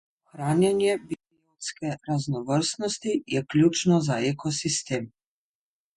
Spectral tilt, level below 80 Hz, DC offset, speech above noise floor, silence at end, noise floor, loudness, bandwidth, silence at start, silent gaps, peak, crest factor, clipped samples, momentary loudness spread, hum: -5 dB/octave; -62 dBFS; under 0.1%; over 65 dB; 0.9 s; under -90 dBFS; -26 LUFS; 11.5 kHz; 0.35 s; none; -8 dBFS; 18 dB; under 0.1%; 12 LU; none